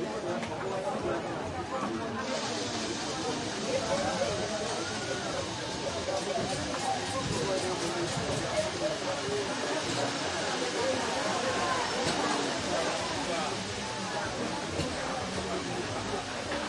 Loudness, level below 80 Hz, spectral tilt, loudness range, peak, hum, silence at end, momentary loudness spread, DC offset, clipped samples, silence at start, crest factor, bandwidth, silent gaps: -32 LUFS; -56 dBFS; -3.5 dB/octave; 3 LU; -16 dBFS; none; 0 s; 5 LU; under 0.1%; under 0.1%; 0 s; 16 dB; 11.5 kHz; none